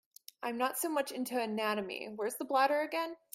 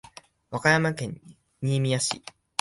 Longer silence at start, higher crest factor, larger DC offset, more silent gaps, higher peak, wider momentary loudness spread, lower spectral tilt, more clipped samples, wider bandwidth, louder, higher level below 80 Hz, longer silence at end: about the same, 0.4 s vs 0.5 s; about the same, 20 dB vs 24 dB; neither; neither; second, -16 dBFS vs -4 dBFS; second, 9 LU vs 15 LU; second, -3 dB/octave vs -4.5 dB/octave; neither; first, 16 kHz vs 11.5 kHz; second, -34 LUFS vs -26 LUFS; second, -82 dBFS vs -62 dBFS; second, 0.2 s vs 0.4 s